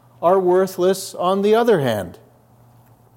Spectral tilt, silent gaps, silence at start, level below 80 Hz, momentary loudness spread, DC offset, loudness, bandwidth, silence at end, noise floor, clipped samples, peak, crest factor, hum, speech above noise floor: -5.5 dB/octave; none; 0.2 s; -66 dBFS; 7 LU; under 0.1%; -18 LUFS; 17 kHz; 1.05 s; -51 dBFS; under 0.1%; -4 dBFS; 16 dB; none; 34 dB